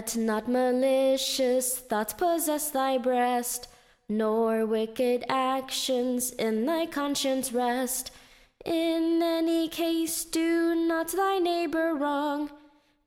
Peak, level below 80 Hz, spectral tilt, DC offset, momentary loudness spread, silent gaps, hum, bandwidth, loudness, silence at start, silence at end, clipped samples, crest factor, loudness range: -12 dBFS; -62 dBFS; -3 dB/octave; under 0.1%; 4 LU; none; none; 17 kHz; -27 LUFS; 0 s; 0.5 s; under 0.1%; 16 dB; 2 LU